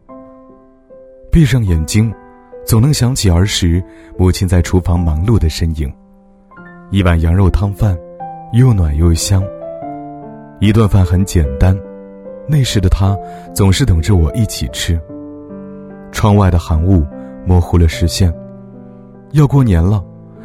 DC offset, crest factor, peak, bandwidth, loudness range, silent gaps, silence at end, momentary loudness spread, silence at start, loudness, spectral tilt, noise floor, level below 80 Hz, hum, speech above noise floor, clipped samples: under 0.1%; 14 dB; 0 dBFS; 14.5 kHz; 2 LU; none; 0 s; 19 LU; 0.1 s; -13 LUFS; -6 dB/octave; -44 dBFS; -22 dBFS; none; 33 dB; under 0.1%